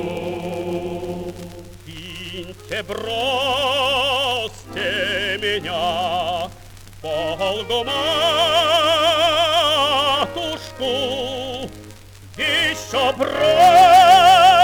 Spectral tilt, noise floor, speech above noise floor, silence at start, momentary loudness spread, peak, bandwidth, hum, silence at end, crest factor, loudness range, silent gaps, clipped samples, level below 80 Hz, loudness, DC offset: -3 dB/octave; -40 dBFS; 23 dB; 0 s; 20 LU; -2 dBFS; 20 kHz; none; 0 s; 16 dB; 7 LU; none; under 0.1%; -46 dBFS; -17 LUFS; under 0.1%